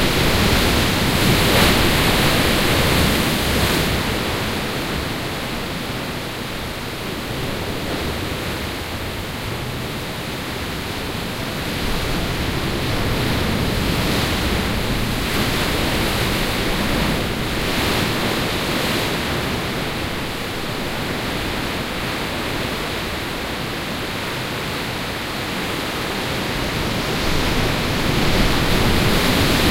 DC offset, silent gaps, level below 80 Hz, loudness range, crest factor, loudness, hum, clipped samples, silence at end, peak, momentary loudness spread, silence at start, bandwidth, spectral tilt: under 0.1%; none; -30 dBFS; 9 LU; 18 dB; -20 LUFS; none; under 0.1%; 0 s; -2 dBFS; 9 LU; 0 s; 16 kHz; -4 dB/octave